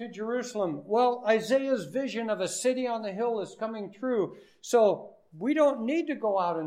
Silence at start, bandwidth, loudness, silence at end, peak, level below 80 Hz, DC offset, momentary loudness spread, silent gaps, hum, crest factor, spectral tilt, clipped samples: 0 s; 15.5 kHz; -28 LUFS; 0 s; -12 dBFS; -80 dBFS; under 0.1%; 10 LU; none; none; 16 dB; -4.5 dB/octave; under 0.1%